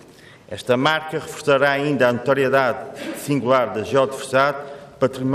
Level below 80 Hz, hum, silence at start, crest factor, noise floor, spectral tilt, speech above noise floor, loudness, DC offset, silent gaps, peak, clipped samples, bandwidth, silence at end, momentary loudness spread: -62 dBFS; none; 0.5 s; 16 dB; -45 dBFS; -5 dB/octave; 26 dB; -20 LUFS; under 0.1%; none; -4 dBFS; under 0.1%; 15 kHz; 0 s; 13 LU